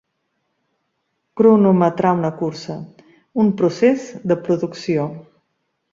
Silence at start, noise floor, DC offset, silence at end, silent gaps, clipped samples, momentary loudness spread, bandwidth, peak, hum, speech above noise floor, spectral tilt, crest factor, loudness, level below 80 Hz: 1.35 s; -72 dBFS; under 0.1%; 0.7 s; none; under 0.1%; 15 LU; 7.6 kHz; -2 dBFS; none; 55 dB; -8 dB/octave; 18 dB; -18 LUFS; -62 dBFS